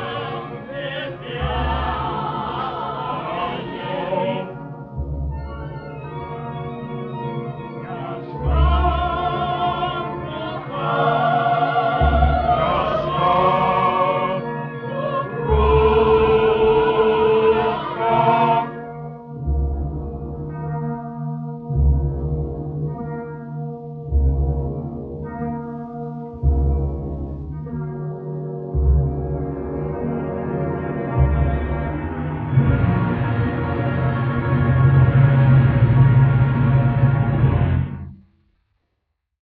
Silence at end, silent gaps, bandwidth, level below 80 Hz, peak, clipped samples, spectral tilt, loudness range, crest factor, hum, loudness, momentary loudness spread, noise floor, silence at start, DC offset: 1.25 s; none; 4.7 kHz; -28 dBFS; -2 dBFS; under 0.1%; -10.5 dB/octave; 10 LU; 16 dB; none; -20 LUFS; 15 LU; -74 dBFS; 0 s; under 0.1%